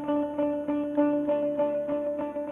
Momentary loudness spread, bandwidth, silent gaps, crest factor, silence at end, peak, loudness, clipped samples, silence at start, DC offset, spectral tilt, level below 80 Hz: 4 LU; 3.6 kHz; none; 16 dB; 0 s; -12 dBFS; -28 LUFS; under 0.1%; 0 s; under 0.1%; -8.5 dB/octave; -62 dBFS